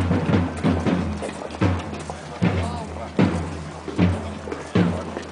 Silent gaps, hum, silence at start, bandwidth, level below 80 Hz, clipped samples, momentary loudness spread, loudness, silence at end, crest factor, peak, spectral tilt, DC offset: none; none; 0 s; 10.5 kHz; -46 dBFS; under 0.1%; 10 LU; -24 LUFS; 0 s; 18 dB; -4 dBFS; -7 dB/octave; under 0.1%